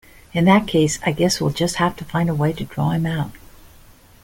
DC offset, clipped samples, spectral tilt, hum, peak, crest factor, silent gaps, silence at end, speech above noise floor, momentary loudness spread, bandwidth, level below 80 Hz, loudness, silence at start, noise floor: under 0.1%; under 0.1%; -5.5 dB/octave; none; -2 dBFS; 18 dB; none; 0.85 s; 28 dB; 8 LU; 17 kHz; -44 dBFS; -20 LUFS; 0.35 s; -47 dBFS